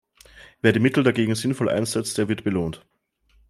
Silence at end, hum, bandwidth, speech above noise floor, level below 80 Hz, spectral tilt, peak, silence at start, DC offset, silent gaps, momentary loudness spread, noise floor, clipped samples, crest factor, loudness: 0.75 s; none; 15 kHz; 40 dB; -56 dBFS; -5.5 dB/octave; -4 dBFS; 0.35 s; under 0.1%; none; 8 LU; -62 dBFS; under 0.1%; 20 dB; -22 LUFS